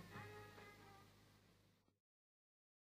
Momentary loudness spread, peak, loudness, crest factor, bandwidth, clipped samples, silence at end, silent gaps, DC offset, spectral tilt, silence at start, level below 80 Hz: 10 LU; -44 dBFS; -61 LUFS; 20 dB; 15.5 kHz; under 0.1%; 0.85 s; none; under 0.1%; -5 dB/octave; 0 s; -82 dBFS